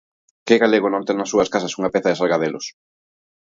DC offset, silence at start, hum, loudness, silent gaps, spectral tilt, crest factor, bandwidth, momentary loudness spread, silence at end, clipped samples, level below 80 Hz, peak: under 0.1%; 0.45 s; none; -19 LUFS; none; -4.5 dB/octave; 18 dB; 7.8 kHz; 13 LU; 0.8 s; under 0.1%; -60 dBFS; -2 dBFS